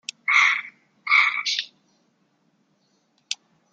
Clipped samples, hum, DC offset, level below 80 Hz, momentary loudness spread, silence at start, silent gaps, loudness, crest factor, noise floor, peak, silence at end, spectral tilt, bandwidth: under 0.1%; none; under 0.1%; under -90 dBFS; 20 LU; 0.25 s; none; -20 LUFS; 22 dB; -67 dBFS; -4 dBFS; 0.4 s; 3.5 dB/octave; 9.4 kHz